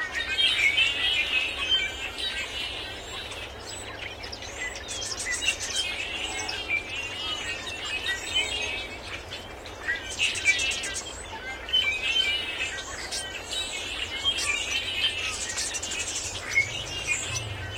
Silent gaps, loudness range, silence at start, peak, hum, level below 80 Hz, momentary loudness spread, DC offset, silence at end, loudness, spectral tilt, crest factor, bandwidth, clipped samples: none; 5 LU; 0 s; -10 dBFS; none; -50 dBFS; 13 LU; under 0.1%; 0 s; -27 LUFS; -0.5 dB/octave; 20 dB; 16.5 kHz; under 0.1%